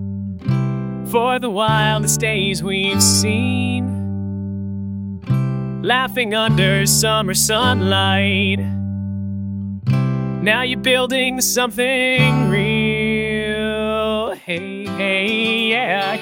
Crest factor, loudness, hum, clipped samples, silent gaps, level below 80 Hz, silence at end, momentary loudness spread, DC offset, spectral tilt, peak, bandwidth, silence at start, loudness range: 18 dB; -17 LUFS; none; under 0.1%; none; -44 dBFS; 0 s; 11 LU; under 0.1%; -4 dB/octave; 0 dBFS; 17 kHz; 0 s; 3 LU